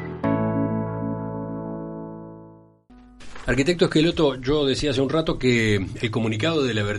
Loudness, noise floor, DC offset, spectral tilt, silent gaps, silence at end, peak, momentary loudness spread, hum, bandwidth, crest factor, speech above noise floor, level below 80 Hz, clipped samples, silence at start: -23 LUFS; -50 dBFS; under 0.1%; -6 dB/octave; none; 0 s; -6 dBFS; 14 LU; none; 11.5 kHz; 18 dB; 29 dB; -42 dBFS; under 0.1%; 0 s